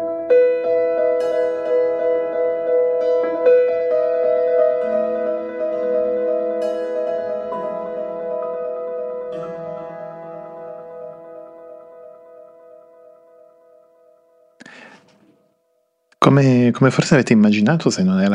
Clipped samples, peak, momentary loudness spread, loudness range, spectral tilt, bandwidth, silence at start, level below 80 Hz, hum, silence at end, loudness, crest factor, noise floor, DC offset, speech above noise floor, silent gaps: under 0.1%; 0 dBFS; 20 LU; 18 LU; -7 dB/octave; 10 kHz; 0 s; -62 dBFS; none; 0 s; -18 LUFS; 18 dB; -66 dBFS; under 0.1%; 52 dB; none